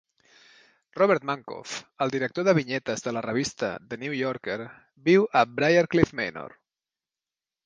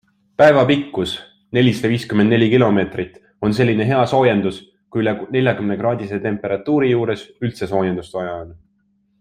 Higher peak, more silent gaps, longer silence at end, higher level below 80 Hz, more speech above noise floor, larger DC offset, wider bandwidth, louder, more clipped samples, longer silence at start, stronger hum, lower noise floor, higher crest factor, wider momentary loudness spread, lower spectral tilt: second, -4 dBFS vs 0 dBFS; neither; first, 1.15 s vs 0.65 s; second, -60 dBFS vs -52 dBFS; first, over 65 dB vs 46 dB; neither; second, 9.8 kHz vs 14 kHz; second, -25 LUFS vs -18 LUFS; neither; first, 0.95 s vs 0.4 s; neither; first, under -90 dBFS vs -63 dBFS; first, 22 dB vs 16 dB; about the same, 15 LU vs 13 LU; second, -5.5 dB/octave vs -7 dB/octave